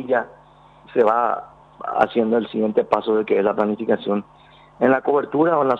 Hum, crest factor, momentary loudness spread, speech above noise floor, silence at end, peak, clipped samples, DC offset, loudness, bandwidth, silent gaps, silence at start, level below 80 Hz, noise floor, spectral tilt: none; 18 dB; 8 LU; 30 dB; 0 s; -2 dBFS; under 0.1%; under 0.1%; -20 LUFS; 5.8 kHz; none; 0 s; -62 dBFS; -49 dBFS; -8 dB/octave